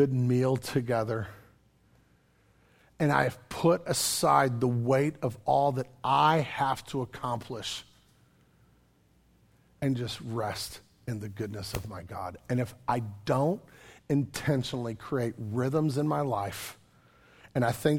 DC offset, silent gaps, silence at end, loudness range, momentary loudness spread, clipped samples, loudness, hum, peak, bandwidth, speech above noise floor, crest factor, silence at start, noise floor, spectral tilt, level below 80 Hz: under 0.1%; none; 0 s; 10 LU; 13 LU; under 0.1%; -30 LUFS; none; -8 dBFS; 17.5 kHz; 36 dB; 22 dB; 0 s; -65 dBFS; -5.5 dB/octave; -60 dBFS